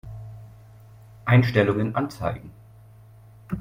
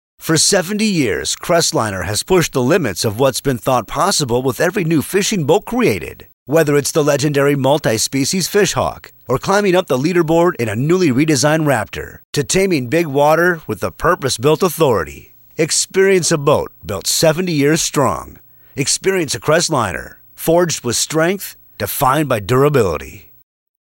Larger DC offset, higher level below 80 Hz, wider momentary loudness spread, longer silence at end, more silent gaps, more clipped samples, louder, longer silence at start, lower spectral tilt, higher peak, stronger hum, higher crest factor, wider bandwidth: neither; second, -52 dBFS vs -42 dBFS; first, 22 LU vs 9 LU; second, 0 s vs 0.65 s; second, none vs 6.33-6.46 s, 12.25-12.33 s; neither; second, -23 LUFS vs -15 LUFS; second, 0.05 s vs 0.2 s; first, -8 dB/octave vs -4 dB/octave; second, -6 dBFS vs -2 dBFS; neither; first, 20 dB vs 14 dB; second, 15 kHz vs 17 kHz